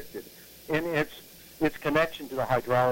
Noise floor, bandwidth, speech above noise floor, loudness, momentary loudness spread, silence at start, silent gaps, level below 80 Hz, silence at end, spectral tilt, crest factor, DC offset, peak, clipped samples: -48 dBFS; 16.5 kHz; 21 dB; -28 LUFS; 20 LU; 0 s; none; -54 dBFS; 0 s; -5.5 dB/octave; 18 dB; under 0.1%; -12 dBFS; under 0.1%